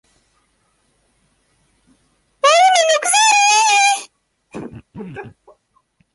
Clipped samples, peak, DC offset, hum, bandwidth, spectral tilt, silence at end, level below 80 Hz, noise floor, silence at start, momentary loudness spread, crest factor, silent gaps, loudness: under 0.1%; -2 dBFS; under 0.1%; none; 11.5 kHz; 0.5 dB/octave; 0.85 s; -60 dBFS; -63 dBFS; 2.45 s; 24 LU; 18 dB; none; -12 LUFS